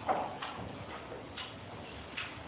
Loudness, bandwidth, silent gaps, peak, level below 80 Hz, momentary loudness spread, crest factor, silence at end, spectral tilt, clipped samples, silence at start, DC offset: -42 LUFS; 4 kHz; none; -20 dBFS; -60 dBFS; 10 LU; 22 dB; 0 s; -2.5 dB/octave; under 0.1%; 0 s; under 0.1%